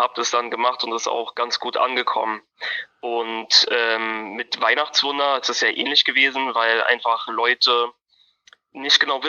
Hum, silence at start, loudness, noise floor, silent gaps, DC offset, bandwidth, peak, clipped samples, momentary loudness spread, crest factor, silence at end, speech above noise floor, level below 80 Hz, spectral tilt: none; 0 s; -19 LUFS; -57 dBFS; none; under 0.1%; 7.4 kHz; -2 dBFS; under 0.1%; 11 LU; 20 dB; 0 s; 36 dB; -78 dBFS; 0 dB/octave